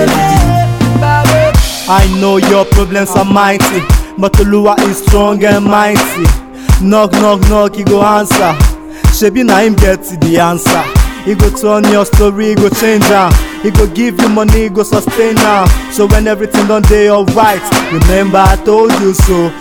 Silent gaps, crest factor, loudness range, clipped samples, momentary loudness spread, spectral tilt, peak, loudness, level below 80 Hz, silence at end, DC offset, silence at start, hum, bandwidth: none; 8 dB; 1 LU; 4%; 4 LU; -5.5 dB/octave; 0 dBFS; -9 LUFS; -14 dBFS; 0 s; under 0.1%; 0 s; none; 20 kHz